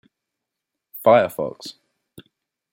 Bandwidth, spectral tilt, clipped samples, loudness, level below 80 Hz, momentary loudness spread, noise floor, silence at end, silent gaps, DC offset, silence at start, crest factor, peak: 16.5 kHz; -5.5 dB/octave; under 0.1%; -19 LUFS; -68 dBFS; 22 LU; -83 dBFS; 1 s; none; under 0.1%; 0.95 s; 20 dB; -4 dBFS